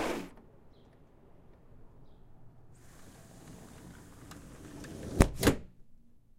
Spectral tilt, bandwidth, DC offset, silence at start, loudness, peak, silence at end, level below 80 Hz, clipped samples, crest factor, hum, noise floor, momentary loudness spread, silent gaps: -5.5 dB/octave; 16 kHz; under 0.1%; 0 s; -32 LUFS; -4 dBFS; 0.45 s; -42 dBFS; under 0.1%; 34 dB; none; -58 dBFS; 26 LU; none